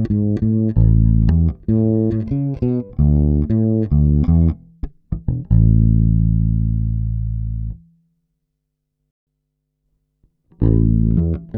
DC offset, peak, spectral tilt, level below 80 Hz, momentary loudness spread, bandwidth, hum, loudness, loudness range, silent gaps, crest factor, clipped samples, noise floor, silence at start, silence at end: under 0.1%; -2 dBFS; -13.5 dB/octave; -22 dBFS; 10 LU; 2.1 kHz; none; -17 LUFS; 11 LU; 9.11-9.27 s; 14 dB; under 0.1%; -75 dBFS; 0 s; 0 s